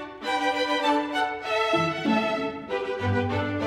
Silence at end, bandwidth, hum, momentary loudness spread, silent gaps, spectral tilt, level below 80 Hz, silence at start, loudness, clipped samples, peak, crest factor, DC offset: 0 s; 15.5 kHz; none; 6 LU; none; -5.5 dB/octave; -60 dBFS; 0 s; -26 LUFS; under 0.1%; -12 dBFS; 14 dB; under 0.1%